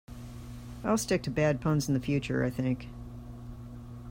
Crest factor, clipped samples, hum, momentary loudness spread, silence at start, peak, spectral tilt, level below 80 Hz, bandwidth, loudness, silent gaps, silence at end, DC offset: 16 dB; under 0.1%; 60 Hz at -45 dBFS; 17 LU; 0.1 s; -16 dBFS; -6 dB/octave; -50 dBFS; 16 kHz; -30 LUFS; none; 0 s; under 0.1%